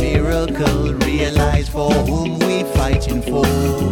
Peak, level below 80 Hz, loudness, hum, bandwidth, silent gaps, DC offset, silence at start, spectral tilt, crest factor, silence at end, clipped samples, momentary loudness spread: -4 dBFS; -24 dBFS; -17 LUFS; none; 18.5 kHz; none; under 0.1%; 0 s; -6 dB/octave; 12 dB; 0 s; under 0.1%; 2 LU